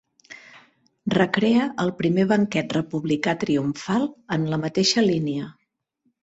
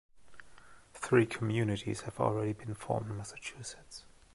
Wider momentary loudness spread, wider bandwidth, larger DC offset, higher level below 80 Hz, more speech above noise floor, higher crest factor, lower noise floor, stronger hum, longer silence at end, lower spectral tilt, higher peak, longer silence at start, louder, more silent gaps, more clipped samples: second, 9 LU vs 19 LU; second, 8.2 kHz vs 11.5 kHz; neither; about the same, -60 dBFS vs -62 dBFS; first, 51 dB vs 24 dB; about the same, 18 dB vs 22 dB; first, -73 dBFS vs -57 dBFS; neither; first, 0.7 s vs 0.25 s; about the same, -5.5 dB/octave vs -6 dB/octave; first, -6 dBFS vs -12 dBFS; first, 0.3 s vs 0.15 s; first, -23 LUFS vs -34 LUFS; neither; neither